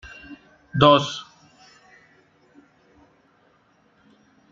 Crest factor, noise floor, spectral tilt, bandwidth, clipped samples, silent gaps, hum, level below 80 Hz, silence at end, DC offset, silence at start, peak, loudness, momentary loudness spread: 24 dB; -61 dBFS; -5.5 dB/octave; 7.6 kHz; under 0.1%; none; none; -56 dBFS; 3.3 s; under 0.1%; 0.3 s; -2 dBFS; -19 LUFS; 27 LU